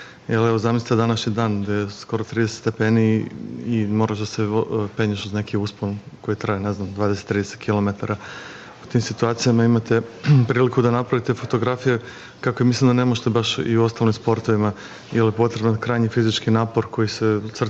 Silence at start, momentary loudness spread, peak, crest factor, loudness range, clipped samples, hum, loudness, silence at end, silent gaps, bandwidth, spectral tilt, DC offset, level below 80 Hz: 0 s; 9 LU; -6 dBFS; 14 dB; 5 LU; under 0.1%; none; -21 LUFS; 0 s; none; 8 kHz; -6.5 dB/octave; under 0.1%; -58 dBFS